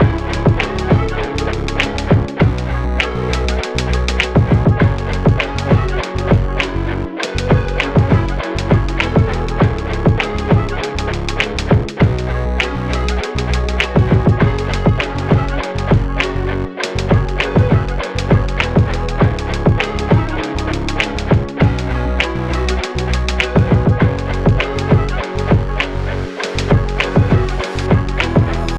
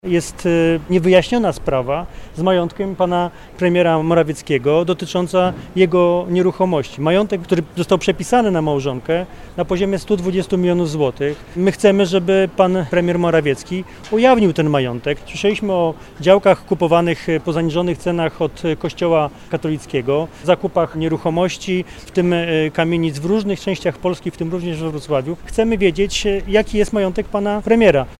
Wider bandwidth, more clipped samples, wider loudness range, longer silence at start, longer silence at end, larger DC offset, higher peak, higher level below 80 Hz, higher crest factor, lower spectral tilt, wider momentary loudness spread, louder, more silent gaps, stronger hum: second, 9.6 kHz vs 13.5 kHz; neither; about the same, 1 LU vs 3 LU; about the same, 0 s vs 0.05 s; about the same, 0 s vs 0.05 s; neither; about the same, -2 dBFS vs 0 dBFS; first, -22 dBFS vs -38 dBFS; about the same, 14 dB vs 16 dB; about the same, -6.5 dB/octave vs -6 dB/octave; about the same, 7 LU vs 9 LU; about the same, -16 LUFS vs -17 LUFS; neither; neither